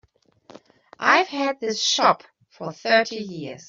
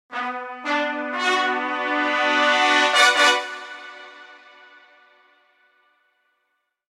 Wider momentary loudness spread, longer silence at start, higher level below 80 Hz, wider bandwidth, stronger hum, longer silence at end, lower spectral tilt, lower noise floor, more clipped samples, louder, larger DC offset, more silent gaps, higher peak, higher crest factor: second, 15 LU vs 22 LU; first, 0.55 s vs 0.1 s; first, -72 dBFS vs -80 dBFS; second, 7.6 kHz vs 15.5 kHz; neither; second, 0.05 s vs 2.55 s; first, -2 dB/octave vs 1 dB/octave; second, -54 dBFS vs -74 dBFS; neither; about the same, -21 LUFS vs -19 LUFS; neither; neither; about the same, -2 dBFS vs -2 dBFS; about the same, 22 dB vs 20 dB